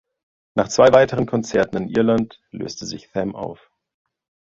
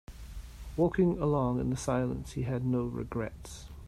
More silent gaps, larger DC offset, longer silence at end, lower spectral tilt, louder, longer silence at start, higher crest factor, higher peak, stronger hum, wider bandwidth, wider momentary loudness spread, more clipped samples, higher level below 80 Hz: neither; neither; first, 1 s vs 0 s; second, -5.5 dB/octave vs -7.5 dB/octave; first, -19 LUFS vs -31 LUFS; first, 0.55 s vs 0.1 s; about the same, 20 dB vs 16 dB; first, 0 dBFS vs -14 dBFS; neither; second, 7.8 kHz vs 14 kHz; about the same, 18 LU vs 19 LU; neither; about the same, -50 dBFS vs -46 dBFS